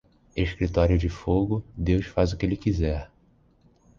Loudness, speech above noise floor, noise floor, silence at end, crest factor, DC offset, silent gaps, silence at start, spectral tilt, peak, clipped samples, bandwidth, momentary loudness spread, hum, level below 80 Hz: -26 LUFS; 36 dB; -60 dBFS; 0.9 s; 18 dB; under 0.1%; none; 0.35 s; -8 dB/octave; -8 dBFS; under 0.1%; 7.2 kHz; 7 LU; none; -34 dBFS